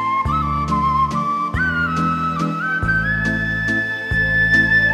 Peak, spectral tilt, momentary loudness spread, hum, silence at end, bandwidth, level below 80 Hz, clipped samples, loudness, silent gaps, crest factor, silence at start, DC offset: -4 dBFS; -6 dB/octave; 7 LU; none; 0 s; 14 kHz; -32 dBFS; under 0.1%; -18 LUFS; none; 14 dB; 0 s; under 0.1%